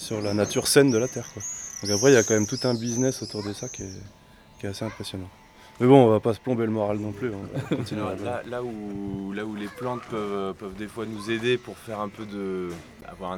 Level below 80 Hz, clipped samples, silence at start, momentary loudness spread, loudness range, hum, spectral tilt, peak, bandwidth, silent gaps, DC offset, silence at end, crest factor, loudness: -56 dBFS; under 0.1%; 0 s; 17 LU; 9 LU; none; -4.5 dB/octave; -2 dBFS; 17 kHz; none; under 0.1%; 0 s; 24 dB; -25 LUFS